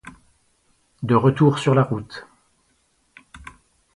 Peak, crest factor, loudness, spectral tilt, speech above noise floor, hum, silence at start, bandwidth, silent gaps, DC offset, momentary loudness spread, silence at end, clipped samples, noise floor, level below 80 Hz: -4 dBFS; 20 dB; -19 LUFS; -7.5 dB/octave; 47 dB; none; 0.05 s; 11 kHz; none; under 0.1%; 26 LU; 0.6 s; under 0.1%; -65 dBFS; -56 dBFS